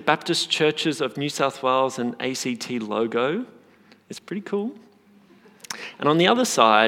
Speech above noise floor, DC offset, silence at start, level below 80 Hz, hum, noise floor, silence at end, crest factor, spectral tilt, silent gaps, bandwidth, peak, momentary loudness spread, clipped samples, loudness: 32 dB; under 0.1%; 0 s; -82 dBFS; none; -54 dBFS; 0 s; 22 dB; -3.5 dB/octave; none; 17 kHz; -2 dBFS; 16 LU; under 0.1%; -23 LUFS